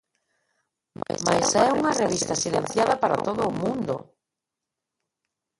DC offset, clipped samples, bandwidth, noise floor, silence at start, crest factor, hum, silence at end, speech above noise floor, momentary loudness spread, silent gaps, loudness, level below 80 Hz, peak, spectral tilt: under 0.1%; under 0.1%; 11.5 kHz; -86 dBFS; 1.1 s; 20 dB; none; 1.55 s; 62 dB; 10 LU; none; -24 LUFS; -58 dBFS; -6 dBFS; -3.5 dB/octave